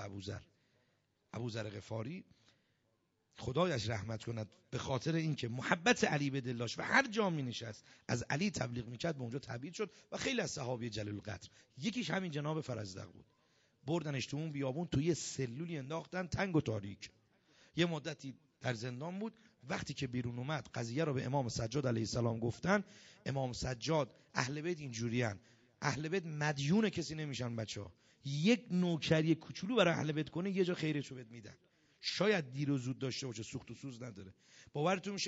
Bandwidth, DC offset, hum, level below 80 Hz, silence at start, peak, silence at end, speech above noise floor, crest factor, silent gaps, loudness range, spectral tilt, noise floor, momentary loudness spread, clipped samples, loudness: 7.6 kHz; under 0.1%; none; -66 dBFS; 0 s; -14 dBFS; 0 s; 42 dB; 26 dB; none; 6 LU; -5 dB/octave; -80 dBFS; 15 LU; under 0.1%; -38 LUFS